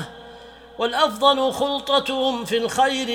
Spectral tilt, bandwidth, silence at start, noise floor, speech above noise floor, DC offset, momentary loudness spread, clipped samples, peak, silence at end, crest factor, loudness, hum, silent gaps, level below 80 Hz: -3 dB/octave; 16.5 kHz; 0 s; -43 dBFS; 22 dB; under 0.1%; 14 LU; under 0.1%; -2 dBFS; 0 s; 20 dB; -20 LUFS; none; none; -56 dBFS